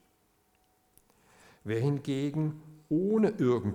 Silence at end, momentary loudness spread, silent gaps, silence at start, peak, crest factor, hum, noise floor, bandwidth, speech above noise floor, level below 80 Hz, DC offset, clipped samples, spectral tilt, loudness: 0 s; 9 LU; none; 1.65 s; -14 dBFS; 16 dB; none; -70 dBFS; 14.5 kHz; 41 dB; -70 dBFS; under 0.1%; under 0.1%; -8.5 dB/octave; -30 LUFS